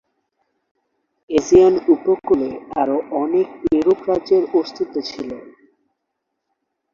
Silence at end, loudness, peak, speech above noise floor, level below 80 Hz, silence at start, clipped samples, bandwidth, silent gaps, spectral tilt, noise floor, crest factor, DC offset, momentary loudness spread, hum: 1.45 s; -18 LUFS; -2 dBFS; 59 dB; -52 dBFS; 1.3 s; under 0.1%; 7.4 kHz; none; -6 dB/octave; -77 dBFS; 18 dB; under 0.1%; 13 LU; none